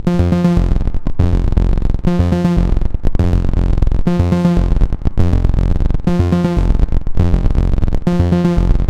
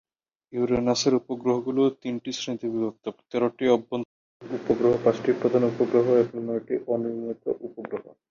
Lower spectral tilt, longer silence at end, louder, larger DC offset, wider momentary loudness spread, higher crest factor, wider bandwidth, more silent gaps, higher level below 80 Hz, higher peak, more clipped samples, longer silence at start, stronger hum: first, -9 dB/octave vs -5.5 dB/octave; second, 0 s vs 0.2 s; first, -16 LUFS vs -25 LUFS; neither; second, 4 LU vs 12 LU; second, 12 dB vs 18 dB; about the same, 8 kHz vs 7.4 kHz; second, none vs 4.05-4.40 s; first, -16 dBFS vs -60 dBFS; first, 0 dBFS vs -8 dBFS; neither; second, 0 s vs 0.5 s; neither